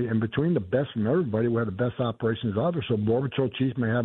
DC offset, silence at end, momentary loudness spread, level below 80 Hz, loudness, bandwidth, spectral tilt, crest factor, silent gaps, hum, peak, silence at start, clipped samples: under 0.1%; 0 s; 3 LU; -58 dBFS; -26 LUFS; 4.1 kHz; -11 dB/octave; 16 dB; none; none; -10 dBFS; 0 s; under 0.1%